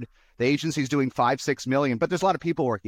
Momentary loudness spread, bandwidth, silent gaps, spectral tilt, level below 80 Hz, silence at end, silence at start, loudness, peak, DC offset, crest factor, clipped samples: 3 LU; 15.5 kHz; none; -5.5 dB/octave; -60 dBFS; 0 s; 0 s; -25 LUFS; -10 dBFS; under 0.1%; 14 dB; under 0.1%